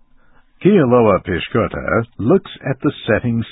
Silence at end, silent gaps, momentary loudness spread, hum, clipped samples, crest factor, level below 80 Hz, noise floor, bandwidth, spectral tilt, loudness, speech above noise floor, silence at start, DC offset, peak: 0 s; none; 8 LU; none; under 0.1%; 16 dB; -40 dBFS; -49 dBFS; 4 kHz; -12.5 dB/octave; -16 LUFS; 33 dB; 0.6 s; under 0.1%; 0 dBFS